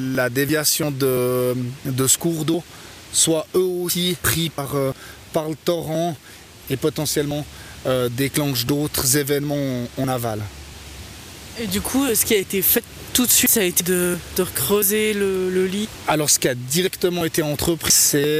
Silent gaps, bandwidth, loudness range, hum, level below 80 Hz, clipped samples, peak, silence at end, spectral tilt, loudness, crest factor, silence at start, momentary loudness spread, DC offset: none; 16 kHz; 6 LU; none; -46 dBFS; under 0.1%; -4 dBFS; 0 s; -3.5 dB/octave; -20 LUFS; 16 dB; 0 s; 13 LU; under 0.1%